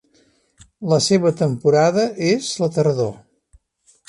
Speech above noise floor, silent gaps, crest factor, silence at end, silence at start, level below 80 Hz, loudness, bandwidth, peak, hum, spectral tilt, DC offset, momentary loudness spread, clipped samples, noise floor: 42 dB; none; 16 dB; 0.95 s; 0.8 s; -58 dBFS; -18 LUFS; 11.5 kHz; -4 dBFS; none; -5.5 dB/octave; under 0.1%; 7 LU; under 0.1%; -59 dBFS